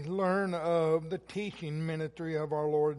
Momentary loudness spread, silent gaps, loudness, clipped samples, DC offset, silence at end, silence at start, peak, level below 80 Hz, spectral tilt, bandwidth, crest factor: 8 LU; none; -32 LUFS; under 0.1%; under 0.1%; 0 s; 0 s; -16 dBFS; -66 dBFS; -7.5 dB/octave; 11.5 kHz; 16 dB